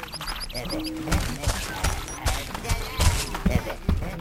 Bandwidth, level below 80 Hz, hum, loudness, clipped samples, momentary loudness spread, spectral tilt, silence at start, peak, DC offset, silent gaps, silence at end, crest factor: 16.5 kHz; -30 dBFS; none; -28 LUFS; under 0.1%; 7 LU; -4 dB/octave; 0 s; -6 dBFS; under 0.1%; none; 0 s; 20 dB